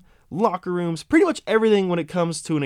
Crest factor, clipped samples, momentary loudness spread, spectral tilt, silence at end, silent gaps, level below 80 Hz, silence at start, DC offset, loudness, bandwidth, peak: 16 dB; under 0.1%; 7 LU; -6 dB/octave; 0 s; none; -56 dBFS; 0.3 s; under 0.1%; -21 LUFS; 13.5 kHz; -4 dBFS